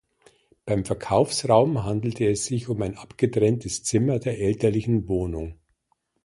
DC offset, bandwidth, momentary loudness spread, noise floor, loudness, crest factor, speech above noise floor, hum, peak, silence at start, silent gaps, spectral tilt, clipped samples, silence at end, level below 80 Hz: under 0.1%; 11.5 kHz; 9 LU; -72 dBFS; -24 LUFS; 20 dB; 49 dB; none; -4 dBFS; 0.65 s; none; -6 dB/octave; under 0.1%; 0.7 s; -46 dBFS